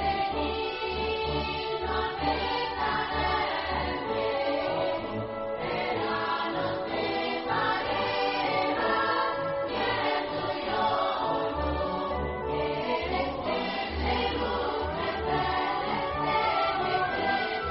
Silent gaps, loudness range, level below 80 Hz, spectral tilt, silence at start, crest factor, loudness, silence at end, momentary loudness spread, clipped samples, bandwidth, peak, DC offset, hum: none; 2 LU; -44 dBFS; -2.5 dB/octave; 0 s; 16 dB; -29 LUFS; 0 s; 4 LU; under 0.1%; 5.8 kHz; -14 dBFS; under 0.1%; none